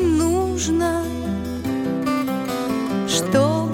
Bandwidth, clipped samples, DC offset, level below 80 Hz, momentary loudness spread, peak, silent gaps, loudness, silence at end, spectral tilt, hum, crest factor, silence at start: 19 kHz; under 0.1%; under 0.1%; -38 dBFS; 7 LU; -6 dBFS; none; -21 LUFS; 0 s; -5 dB/octave; none; 16 dB; 0 s